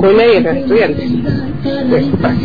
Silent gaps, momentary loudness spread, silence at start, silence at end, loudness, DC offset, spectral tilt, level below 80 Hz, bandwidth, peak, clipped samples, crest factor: none; 9 LU; 0 s; 0 s; -12 LUFS; 3%; -9 dB/octave; -34 dBFS; 5 kHz; -2 dBFS; under 0.1%; 10 dB